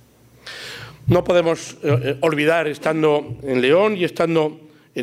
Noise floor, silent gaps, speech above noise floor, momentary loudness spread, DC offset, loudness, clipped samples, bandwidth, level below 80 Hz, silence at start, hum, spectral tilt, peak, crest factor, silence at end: -43 dBFS; none; 25 dB; 16 LU; under 0.1%; -19 LUFS; under 0.1%; 15.5 kHz; -50 dBFS; 0.45 s; none; -6 dB/octave; -4 dBFS; 16 dB; 0 s